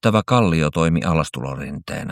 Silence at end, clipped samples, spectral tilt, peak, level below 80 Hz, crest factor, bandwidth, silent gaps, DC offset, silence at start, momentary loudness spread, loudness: 0 s; under 0.1%; -6.5 dB/octave; -2 dBFS; -38 dBFS; 16 dB; 13 kHz; none; under 0.1%; 0.05 s; 12 LU; -20 LUFS